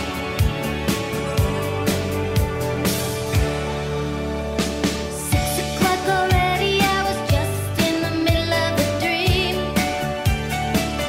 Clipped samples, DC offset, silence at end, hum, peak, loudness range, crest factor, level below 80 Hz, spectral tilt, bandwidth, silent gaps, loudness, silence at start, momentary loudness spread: under 0.1%; under 0.1%; 0 s; none; -4 dBFS; 3 LU; 16 dB; -32 dBFS; -4.5 dB/octave; 16 kHz; none; -21 LUFS; 0 s; 5 LU